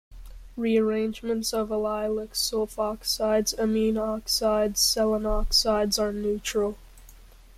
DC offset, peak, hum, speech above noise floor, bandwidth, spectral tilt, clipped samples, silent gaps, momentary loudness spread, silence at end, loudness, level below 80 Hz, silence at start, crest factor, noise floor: under 0.1%; -8 dBFS; none; 24 dB; 16 kHz; -3 dB/octave; under 0.1%; none; 7 LU; 0.3 s; -25 LUFS; -40 dBFS; 0.1 s; 18 dB; -49 dBFS